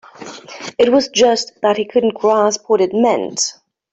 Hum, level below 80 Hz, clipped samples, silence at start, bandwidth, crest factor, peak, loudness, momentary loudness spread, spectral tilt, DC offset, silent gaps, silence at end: none; -60 dBFS; under 0.1%; 0.2 s; 8.2 kHz; 14 dB; -2 dBFS; -15 LUFS; 16 LU; -3 dB/octave; under 0.1%; none; 0.4 s